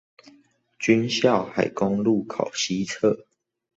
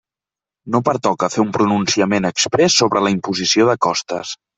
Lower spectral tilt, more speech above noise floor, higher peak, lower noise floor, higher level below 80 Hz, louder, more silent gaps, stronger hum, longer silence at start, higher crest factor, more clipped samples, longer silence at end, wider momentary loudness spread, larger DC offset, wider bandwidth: about the same, -4.5 dB/octave vs -3.5 dB/octave; second, 36 dB vs 73 dB; about the same, -4 dBFS vs -2 dBFS; second, -59 dBFS vs -89 dBFS; second, -62 dBFS vs -56 dBFS; second, -23 LUFS vs -16 LUFS; neither; neither; first, 0.8 s vs 0.65 s; about the same, 20 dB vs 16 dB; neither; first, 0.55 s vs 0.25 s; about the same, 6 LU vs 7 LU; neither; about the same, 8.2 kHz vs 8.4 kHz